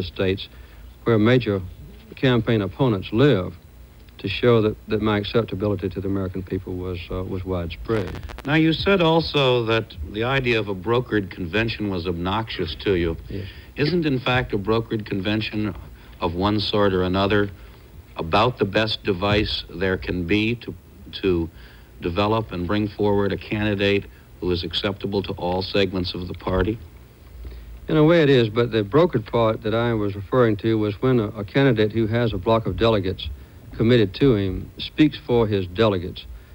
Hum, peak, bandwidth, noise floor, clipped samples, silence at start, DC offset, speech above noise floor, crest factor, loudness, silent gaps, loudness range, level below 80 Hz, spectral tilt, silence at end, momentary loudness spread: none; -4 dBFS; 16.5 kHz; -45 dBFS; under 0.1%; 0 s; under 0.1%; 24 dB; 18 dB; -22 LUFS; none; 4 LU; -40 dBFS; -7.5 dB/octave; 0 s; 12 LU